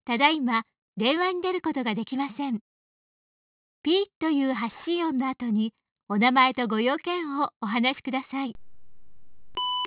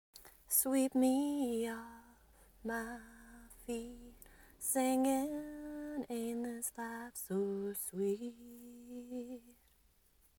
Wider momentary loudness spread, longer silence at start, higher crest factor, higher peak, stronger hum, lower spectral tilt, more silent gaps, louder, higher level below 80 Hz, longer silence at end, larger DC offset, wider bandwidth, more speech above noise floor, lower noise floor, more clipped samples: second, 10 LU vs 22 LU; about the same, 0.05 s vs 0.15 s; about the same, 22 dB vs 22 dB; first, -6 dBFS vs -16 dBFS; neither; second, -2 dB/octave vs -4 dB/octave; first, 0.78-0.93 s, 2.61-3.84 s, 4.16-4.21 s, 5.92-5.96 s, 6.03-6.07 s, 7.56-7.60 s vs none; first, -26 LUFS vs -37 LUFS; about the same, -68 dBFS vs -66 dBFS; second, 0 s vs 0.9 s; neither; second, 4 kHz vs over 20 kHz; first, 39 dB vs 33 dB; second, -65 dBFS vs -71 dBFS; neither